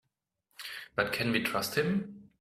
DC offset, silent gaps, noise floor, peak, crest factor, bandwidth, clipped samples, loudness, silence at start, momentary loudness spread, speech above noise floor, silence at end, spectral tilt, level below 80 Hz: under 0.1%; none; -81 dBFS; -12 dBFS; 22 dB; 16 kHz; under 0.1%; -31 LUFS; 0.6 s; 14 LU; 50 dB; 0.15 s; -4.5 dB/octave; -64 dBFS